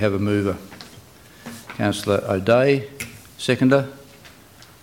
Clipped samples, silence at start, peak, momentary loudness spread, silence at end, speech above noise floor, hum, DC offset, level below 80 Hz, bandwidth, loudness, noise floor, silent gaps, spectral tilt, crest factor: under 0.1%; 0 s; -4 dBFS; 22 LU; 0.55 s; 28 dB; none; under 0.1%; -56 dBFS; 17 kHz; -20 LUFS; -47 dBFS; none; -6 dB/octave; 18 dB